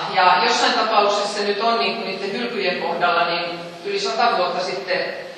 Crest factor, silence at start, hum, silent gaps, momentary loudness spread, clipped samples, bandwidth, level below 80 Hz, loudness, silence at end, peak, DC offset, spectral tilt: 20 dB; 0 s; none; none; 9 LU; under 0.1%; 11.5 kHz; -74 dBFS; -19 LUFS; 0 s; 0 dBFS; under 0.1%; -2.5 dB/octave